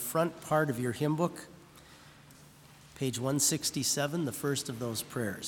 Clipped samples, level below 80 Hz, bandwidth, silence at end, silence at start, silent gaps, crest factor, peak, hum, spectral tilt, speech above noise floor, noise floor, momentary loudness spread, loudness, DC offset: under 0.1%; -68 dBFS; 18 kHz; 0 s; 0 s; none; 20 dB; -14 dBFS; none; -4 dB/octave; 24 dB; -56 dBFS; 8 LU; -31 LUFS; under 0.1%